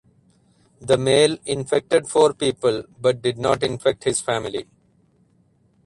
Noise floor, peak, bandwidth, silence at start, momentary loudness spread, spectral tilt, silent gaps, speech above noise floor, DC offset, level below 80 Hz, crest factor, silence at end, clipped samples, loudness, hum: -60 dBFS; -2 dBFS; 11.5 kHz; 0.8 s; 9 LU; -4 dB/octave; none; 40 dB; under 0.1%; -54 dBFS; 18 dB; 1.2 s; under 0.1%; -20 LUFS; none